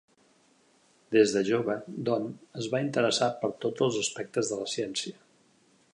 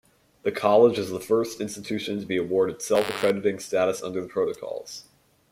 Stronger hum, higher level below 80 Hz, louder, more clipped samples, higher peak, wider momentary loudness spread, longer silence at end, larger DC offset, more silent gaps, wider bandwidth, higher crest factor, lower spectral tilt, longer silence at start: neither; second, -74 dBFS vs -64 dBFS; second, -29 LUFS vs -25 LUFS; neither; second, -10 dBFS vs -6 dBFS; second, 9 LU vs 13 LU; first, 0.8 s vs 0.5 s; neither; neither; second, 11 kHz vs 16.5 kHz; about the same, 20 dB vs 18 dB; about the same, -4 dB/octave vs -4.5 dB/octave; first, 1.1 s vs 0.45 s